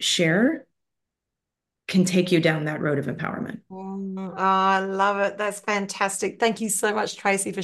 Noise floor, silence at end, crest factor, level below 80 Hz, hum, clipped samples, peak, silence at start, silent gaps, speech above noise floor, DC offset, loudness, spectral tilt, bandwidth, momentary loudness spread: -85 dBFS; 0 s; 18 dB; -70 dBFS; none; under 0.1%; -6 dBFS; 0 s; none; 62 dB; under 0.1%; -23 LUFS; -4 dB/octave; 12.5 kHz; 13 LU